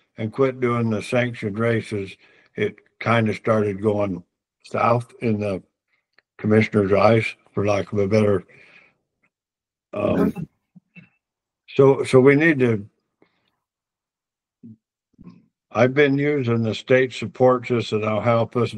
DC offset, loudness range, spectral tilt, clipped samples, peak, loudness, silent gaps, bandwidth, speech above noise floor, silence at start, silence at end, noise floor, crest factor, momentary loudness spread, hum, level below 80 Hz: under 0.1%; 5 LU; -7.5 dB/octave; under 0.1%; 0 dBFS; -20 LUFS; none; 10.5 kHz; 70 dB; 0.2 s; 0 s; -90 dBFS; 22 dB; 12 LU; none; -60 dBFS